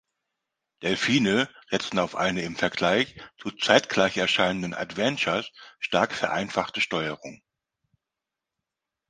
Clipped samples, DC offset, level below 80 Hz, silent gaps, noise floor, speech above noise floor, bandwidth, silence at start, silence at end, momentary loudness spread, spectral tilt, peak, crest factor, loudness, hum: under 0.1%; under 0.1%; -60 dBFS; none; -87 dBFS; 62 dB; 10 kHz; 0.8 s; 1.75 s; 11 LU; -4 dB/octave; 0 dBFS; 26 dB; -25 LUFS; none